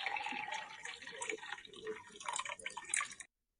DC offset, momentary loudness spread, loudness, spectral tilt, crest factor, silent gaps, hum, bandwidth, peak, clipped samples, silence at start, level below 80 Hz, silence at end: under 0.1%; 10 LU; -42 LUFS; 0.5 dB/octave; 26 dB; none; none; 11.5 kHz; -18 dBFS; under 0.1%; 0 s; -80 dBFS; 0.35 s